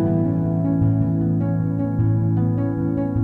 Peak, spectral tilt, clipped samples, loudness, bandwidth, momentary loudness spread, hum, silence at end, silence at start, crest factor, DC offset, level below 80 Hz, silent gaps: -8 dBFS; -13 dB/octave; under 0.1%; -21 LUFS; 2.4 kHz; 3 LU; none; 0 s; 0 s; 12 dB; under 0.1%; -40 dBFS; none